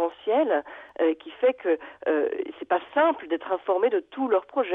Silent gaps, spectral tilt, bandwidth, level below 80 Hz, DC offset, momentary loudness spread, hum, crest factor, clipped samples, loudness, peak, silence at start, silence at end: none; -6.5 dB/octave; 3.9 kHz; -72 dBFS; under 0.1%; 5 LU; none; 16 dB; under 0.1%; -26 LUFS; -10 dBFS; 0 s; 0 s